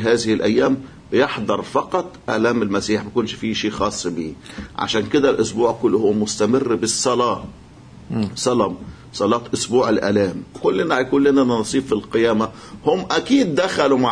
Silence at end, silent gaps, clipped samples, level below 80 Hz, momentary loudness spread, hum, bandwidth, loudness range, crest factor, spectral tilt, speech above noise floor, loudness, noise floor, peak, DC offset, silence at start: 0 s; none; under 0.1%; -48 dBFS; 8 LU; none; 10.5 kHz; 3 LU; 16 dB; -4.5 dB/octave; 23 dB; -19 LUFS; -42 dBFS; -2 dBFS; under 0.1%; 0 s